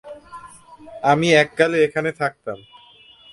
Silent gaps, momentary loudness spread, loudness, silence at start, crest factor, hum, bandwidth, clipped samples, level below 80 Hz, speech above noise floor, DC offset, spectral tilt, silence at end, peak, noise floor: none; 24 LU; -18 LUFS; 0.05 s; 20 dB; none; 11.5 kHz; under 0.1%; -58 dBFS; 30 dB; under 0.1%; -5 dB/octave; 0.75 s; 0 dBFS; -49 dBFS